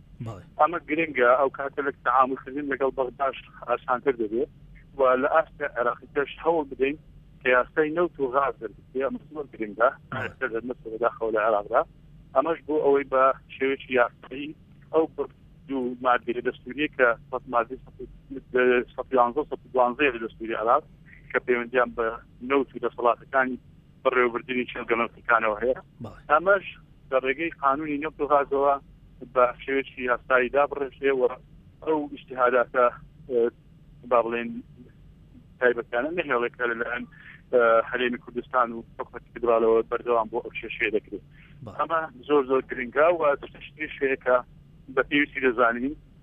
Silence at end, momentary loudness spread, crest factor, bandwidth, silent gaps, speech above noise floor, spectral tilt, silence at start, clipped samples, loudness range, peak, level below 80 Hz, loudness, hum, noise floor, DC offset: 0.25 s; 13 LU; 20 dB; 3.8 kHz; none; 26 dB; -8 dB/octave; 0.2 s; under 0.1%; 3 LU; -6 dBFS; -56 dBFS; -25 LUFS; none; -51 dBFS; under 0.1%